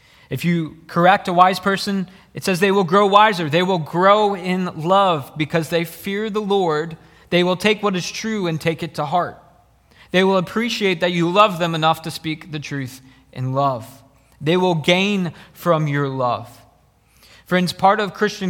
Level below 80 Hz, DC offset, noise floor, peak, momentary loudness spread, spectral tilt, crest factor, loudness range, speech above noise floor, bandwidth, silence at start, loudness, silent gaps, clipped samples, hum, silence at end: -58 dBFS; under 0.1%; -56 dBFS; 0 dBFS; 12 LU; -5.5 dB/octave; 20 dB; 5 LU; 37 dB; 17.5 kHz; 0.3 s; -19 LUFS; none; under 0.1%; none; 0 s